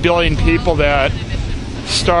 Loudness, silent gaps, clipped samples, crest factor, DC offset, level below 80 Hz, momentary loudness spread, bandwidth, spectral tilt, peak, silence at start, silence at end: -16 LUFS; none; under 0.1%; 14 dB; under 0.1%; -22 dBFS; 9 LU; 11 kHz; -5 dB/octave; 0 dBFS; 0 s; 0 s